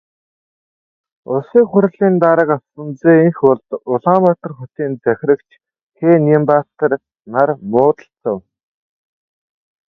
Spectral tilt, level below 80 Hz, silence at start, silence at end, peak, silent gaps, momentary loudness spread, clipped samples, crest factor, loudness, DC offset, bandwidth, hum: -11 dB/octave; -62 dBFS; 1.3 s; 1.5 s; 0 dBFS; 5.83-5.90 s; 12 LU; under 0.1%; 16 dB; -15 LUFS; under 0.1%; 4.4 kHz; none